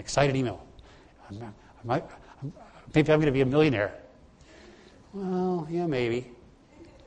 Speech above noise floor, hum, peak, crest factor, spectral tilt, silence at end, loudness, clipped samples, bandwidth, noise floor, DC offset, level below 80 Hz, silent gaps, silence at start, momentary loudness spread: 27 dB; none; -6 dBFS; 22 dB; -6.5 dB/octave; 0.25 s; -27 LUFS; under 0.1%; 9.8 kHz; -54 dBFS; under 0.1%; -52 dBFS; none; 0 s; 21 LU